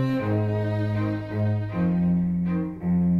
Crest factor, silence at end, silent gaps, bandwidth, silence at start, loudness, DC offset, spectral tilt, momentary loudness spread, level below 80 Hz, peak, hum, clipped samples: 12 dB; 0 s; none; 4.9 kHz; 0 s; -25 LUFS; under 0.1%; -10 dB/octave; 4 LU; -50 dBFS; -12 dBFS; none; under 0.1%